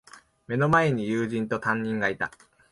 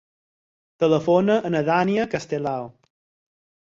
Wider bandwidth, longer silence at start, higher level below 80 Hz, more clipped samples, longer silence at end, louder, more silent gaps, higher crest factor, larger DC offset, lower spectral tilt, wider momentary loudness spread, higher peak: first, 11.5 kHz vs 7.8 kHz; second, 0.15 s vs 0.8 s; about the same, -58 dBFS vs -62 dBFS; neither; second, 0.45 s vs 0.9 s; second, -26 LUFS vs -22 LUFS; neither; about the same, 18 dB vs 18 dB; neither; about the same, -7 dB/octave vs -7 dB/octave; about the same, 11 LU vs 10 LU; second, -10 dBFS vs -6 dBFS